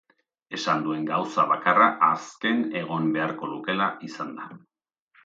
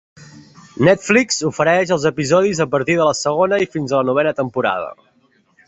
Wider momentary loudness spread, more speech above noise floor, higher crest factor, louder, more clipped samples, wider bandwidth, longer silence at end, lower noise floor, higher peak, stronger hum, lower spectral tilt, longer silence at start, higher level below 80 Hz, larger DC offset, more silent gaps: first, 16 LU vs 5 LU; second, 38 dB vs 42 dB; about the same, 20 dB vs 16 dB; second, -24 LUFS vs -16 LUFS; neither; about the same, 7.8 kHz vs 8.2 kHz; about the same, 0.65 s vs 0.75 s; first, -63 dBFS vs -58 dBFS; second, -4 dBFS vs 0 dBFS; neither; about the same, -5 dB/octave vs -4.5 dB/octave; first, 0.5 s vs 0.2 s; second, -76 dBFS vs -54 dBFS; neither; neither